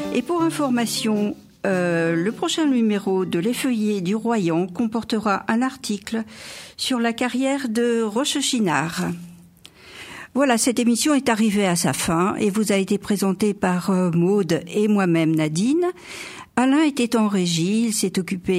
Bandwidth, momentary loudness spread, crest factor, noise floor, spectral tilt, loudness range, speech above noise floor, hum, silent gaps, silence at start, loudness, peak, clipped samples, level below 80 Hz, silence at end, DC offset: 16 kHz; 8 LU; 16 dB; -47 dBFS; -4.5 dB/octave; 3 LU; 27 dB; none; none; 0 s; -21 LUFS; -4 dBFS; under 0.1%; -58 dBFS; 0 s; under 0.1%